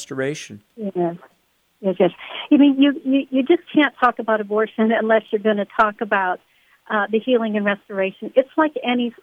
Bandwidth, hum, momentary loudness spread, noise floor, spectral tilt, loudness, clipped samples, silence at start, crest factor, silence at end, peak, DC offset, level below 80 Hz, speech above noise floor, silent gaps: 9.6 kHz; none; 10 LU; -63 dBFS; -6 dB/octave; -19 LUFS; under 0.1%; 0 s; 16 dB; 0.1 s; -2 dBFS; under 0.1%; -64 dBFS; 44 dB; none